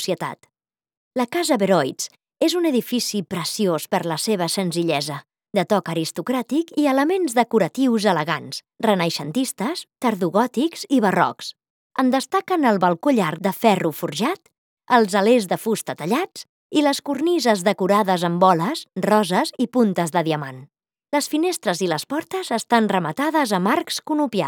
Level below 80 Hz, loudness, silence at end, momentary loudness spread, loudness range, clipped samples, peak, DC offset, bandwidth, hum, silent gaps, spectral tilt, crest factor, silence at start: -74 dBFS; -21 LUFS; 0 s; 8 LU; 3 LU; under 0.1%; -2 dBFS; under 0.1%; 19.5 kHz; none; 0.97-1.11 s, 11.70-11.90 s, 14.58-14.77 s, 16.49-16.70 s; -4.5 dB/octave; 20 dB; 0 s